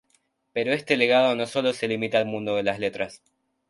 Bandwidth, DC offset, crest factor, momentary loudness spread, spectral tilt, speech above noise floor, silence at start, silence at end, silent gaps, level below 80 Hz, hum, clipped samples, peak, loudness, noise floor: 11.5 kHz; under 0.1%; 20 dB; 10 LU; -5 dB/octave; 44 dB; 0.55 s; 0.55 s; none; -66 dBFS; none; under 0.1%; -6 dBFS; -24 LUFS; -68 dBFS